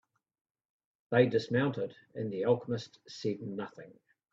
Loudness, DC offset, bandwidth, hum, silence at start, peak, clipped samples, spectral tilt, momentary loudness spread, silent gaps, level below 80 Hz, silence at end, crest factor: -33 LUFS; under 0.1%; 7.6 kHz; none; 1.1 s; -10 dBFS; under 0.1%; -7 dB/octave; 13 LU; none; -74 dBFS; 0.4 s; 24 dB